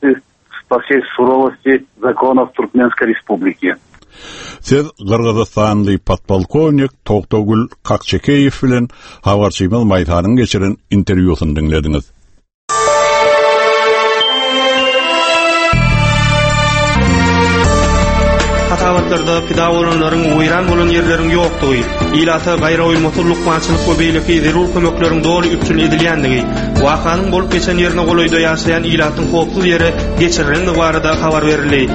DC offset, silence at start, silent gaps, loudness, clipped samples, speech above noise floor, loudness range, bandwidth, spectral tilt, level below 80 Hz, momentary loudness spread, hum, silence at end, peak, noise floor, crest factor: under 0.1%; 0 s; 12.54-12.68 s; -12 LUFS; under 0.1%; 24 dB; 4 LU; 8.8 kHz; -5.5 dB/octave; -24 dBFS; 5 LU; none; 0 s; 0 dBFS; -36 dBFS; 12 dB